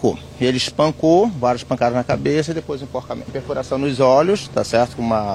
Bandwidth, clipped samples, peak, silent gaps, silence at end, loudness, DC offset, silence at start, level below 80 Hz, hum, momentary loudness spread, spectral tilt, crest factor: 13 kHz; under 0.1%; -2 dBFS; none; 0 s; -19 LUFS; under 0.1%; 0 s; -46 dBFS; none; 12 LU; -5.5 dB/octave; 16 dB